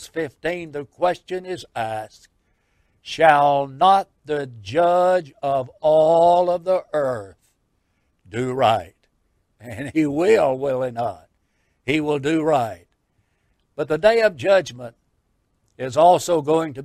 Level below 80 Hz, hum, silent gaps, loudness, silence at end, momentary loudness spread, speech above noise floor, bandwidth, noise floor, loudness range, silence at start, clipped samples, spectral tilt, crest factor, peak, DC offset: -58 dBFS; none; none; -20 LUFS; 0 s; 16 LU; 49 dB; 14.5 kHz; -68 dBFS; 6 LU; 0 s; under 0.1%; -5.5 dB/octave; 20 dB; 0 dBFS; under 0.1%